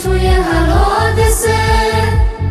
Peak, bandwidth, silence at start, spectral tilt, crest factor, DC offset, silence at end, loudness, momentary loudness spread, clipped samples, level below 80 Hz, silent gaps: 0 dBFS; 14.5 kHz; 0 s; -5 dB/octave; 10 dB; under 0.1%; 0 s; -13 LUFS; 2 LU; under 0.1%; -16 dBFS; none